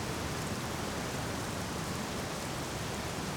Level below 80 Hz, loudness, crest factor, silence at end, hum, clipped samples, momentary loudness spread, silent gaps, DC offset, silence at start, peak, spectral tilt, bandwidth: -50 dBFS; -36 LUFS; 12 dB; 0 s; none; under 0.1%; 1 LU; none; under 0.1%; 0 s; -24 dBFS; -4 dB/octave; over 20 kHz